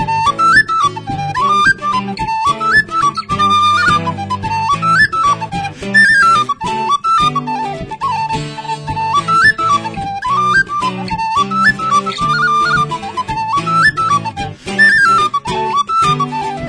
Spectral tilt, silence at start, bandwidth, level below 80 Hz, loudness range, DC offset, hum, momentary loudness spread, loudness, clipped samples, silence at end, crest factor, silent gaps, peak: -3.5 dB/octave; 0 s; 10.5 kHz; -40 dBFS; 3 LU; under 0.1%; none; 11 LU; -13 LUFS; under 0.1%; 0 s; 14 dB; none; 0 dBFS